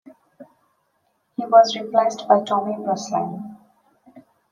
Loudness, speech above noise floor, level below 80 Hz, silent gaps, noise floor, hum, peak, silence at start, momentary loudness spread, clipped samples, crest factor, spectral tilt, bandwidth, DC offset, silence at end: -20 LUFS; 50 dB; -76 dBFS; none; -69 dBFS; none; -2 dBFS; 0.4 s; 18 LU; under 0.1%; 20 dB; -4.5 dB/octave; 9.2 kHz; under 0.1%; 0.3 s